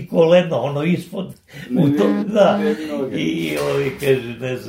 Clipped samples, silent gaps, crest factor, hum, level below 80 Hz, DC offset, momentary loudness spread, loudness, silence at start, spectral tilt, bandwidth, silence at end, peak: under 0.1%; none; 16 dB; none; -54 dBFS; under 0.1%; 12 LU; -18 LUFS; 0 s; -7 dB/octave; 16 kHz; 0 s; -2 dBFS